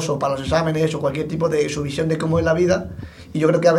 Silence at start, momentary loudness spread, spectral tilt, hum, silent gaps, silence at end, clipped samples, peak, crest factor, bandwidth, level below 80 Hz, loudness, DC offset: 0 s; 6 LU; -6 dB/octave; none; none; 0 s; under 0.1%; -2 dBFS; 18 dB; 12.5 kHz; -42 dBFS; -20 LUFS; under 0.1%